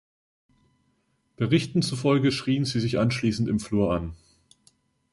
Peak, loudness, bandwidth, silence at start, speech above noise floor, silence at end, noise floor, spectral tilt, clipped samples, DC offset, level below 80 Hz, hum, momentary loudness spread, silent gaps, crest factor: -8 dBFS; -25 LUFS; 11.5 kHz; 1.4 s; 46 dB; 1 s; -70 dBFS; -6 dB/octave; under 0.1%; under 0.1%; -50 dBFS; none; 5 LU; none; 20 dB